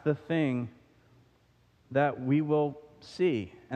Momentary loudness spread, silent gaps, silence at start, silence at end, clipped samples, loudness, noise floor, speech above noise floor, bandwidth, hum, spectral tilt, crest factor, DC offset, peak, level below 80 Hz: 13 LU; none; 0.05 s; 0 s; under 0.1%; -30 LUFS; -65 dBFS; 36 dB; 9 kHz; none; -8.5 dB/octave; 18 dB; under 0.1%; -14 dBFS; -70 dBFS